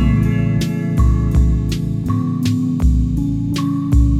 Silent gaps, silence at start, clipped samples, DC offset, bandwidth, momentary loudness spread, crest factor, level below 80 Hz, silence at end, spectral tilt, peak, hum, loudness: none; 0 s; under 0.1%; under 0.1%; 13 kHz; 4 LU; 12 dB; -20 dBFS; 0 s; -7.5 dB/octave; -4 dBFS; none; -17 LUFS